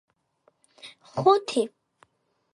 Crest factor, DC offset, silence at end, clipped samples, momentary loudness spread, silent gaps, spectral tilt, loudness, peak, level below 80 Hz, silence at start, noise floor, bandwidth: 22 dB; under 0.1%; 0.85 s; under 0.1%; 25 LU; none; -5.5 dB/octave; -24 LUFS; -6 dBFS; -74 dBFS; 0.85 s; -71 dBFS; 11.5 kHz